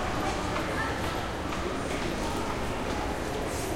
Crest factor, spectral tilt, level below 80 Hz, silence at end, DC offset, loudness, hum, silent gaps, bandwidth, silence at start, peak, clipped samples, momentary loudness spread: 14 dB; -4.5 dB/octave; -40 dBFS; 0 s; under 0.1%; -31 LUFS; none; none; 16.5 kHz; 0 s; -18 dBFS; under 0.1%; 2 LU